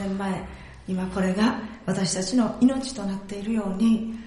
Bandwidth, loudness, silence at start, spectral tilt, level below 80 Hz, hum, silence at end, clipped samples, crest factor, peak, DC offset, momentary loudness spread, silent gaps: 11.5 kHz; -25 LUFS; 0 s; -5.5 dB/octave; -48 dBFS; none; 0 s; under 0.1%; 16 dB; -8 dBFS; under 0.1%; 10 LU; none